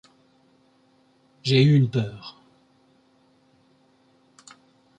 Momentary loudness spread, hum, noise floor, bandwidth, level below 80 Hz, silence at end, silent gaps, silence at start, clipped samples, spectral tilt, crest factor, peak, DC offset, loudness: 23 LU; none; -61 dBFS; 9 kHz; -64 dBFS; 2.7 s; none; 1.45 s; under 0.1%; -7 dB/octave; 20 dB; -6 dBFS; under 0.1%; -21 LUFS